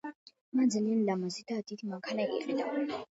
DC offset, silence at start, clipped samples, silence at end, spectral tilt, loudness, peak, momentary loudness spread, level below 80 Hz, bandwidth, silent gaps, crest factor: under 0.1%; 0.05 s; under 0.1%; 0.1 s; -5.5 dB/octave; -33 LUFS; -18 dBFS; 10 LU; -80 dBFS; 8 kHz; 0.15-0.26 s, 0.41-0.52 s; 14 dB